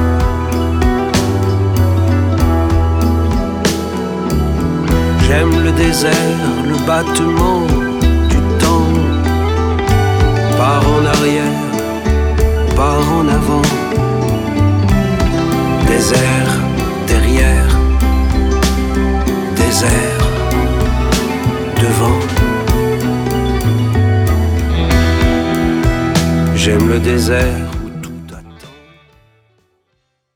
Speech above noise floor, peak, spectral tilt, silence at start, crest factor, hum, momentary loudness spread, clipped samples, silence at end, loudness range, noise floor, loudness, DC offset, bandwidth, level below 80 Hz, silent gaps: 54 dB; 0 dBFS; -6 dB/octave; 0 s; 12 dB; none; 4 LU; under 0.1%; 1.65 s; 2 LU; -65 dBFS; -13 LUFS; under 0.1%; 18 kHz; -18 dBFS; none